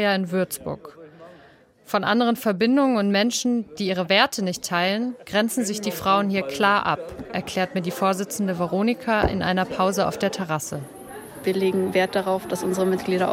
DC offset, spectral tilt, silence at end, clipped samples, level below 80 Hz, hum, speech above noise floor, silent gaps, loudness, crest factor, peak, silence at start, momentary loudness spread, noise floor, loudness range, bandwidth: under 0.1%; -4.5 dB/octave; 0 s; under 0.1%; -48 dBFS; none; 30 dB; none; -23 LUFS; 20 dB; -2 dBFS; 0 s; 8 LU; -52 dBFS; 3 LU; 16.5 kHz